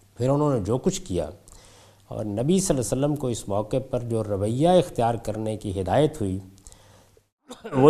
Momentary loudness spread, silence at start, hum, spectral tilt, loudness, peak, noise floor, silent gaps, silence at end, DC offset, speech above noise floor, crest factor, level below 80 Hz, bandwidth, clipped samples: 10 LU; 0.2 s; none; -6.5 dB/octave; -25 LUFS; -2 dBFS; -55 dBFS; 7.32-7.37 s; 0 s; under 0.1%; 32 dB; 22 dB; -48 dBFS; 14.5 kHz; under 0.1%